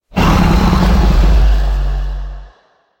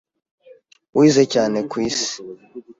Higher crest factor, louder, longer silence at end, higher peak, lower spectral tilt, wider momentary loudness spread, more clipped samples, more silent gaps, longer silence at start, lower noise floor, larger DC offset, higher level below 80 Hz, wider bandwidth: second, 10 dB vs 18 dB; first, -13 LUFS vs -18 LUFS; first, 0.55 s vs 0.05 s; about the same, -2 dBFS vs -2 dBFS; first, -6.5 dB/octave vs -4.5 dB/octave; second, 13 LU vs 20 LU; neither; neither; second, 0.15 s vs 0.95 s; about the same, -52 dBFS vs -50 dBFS; neither; first, -14 dBFS vs -58 dBFS; first, 16.5 kHz vs 7.8 kHz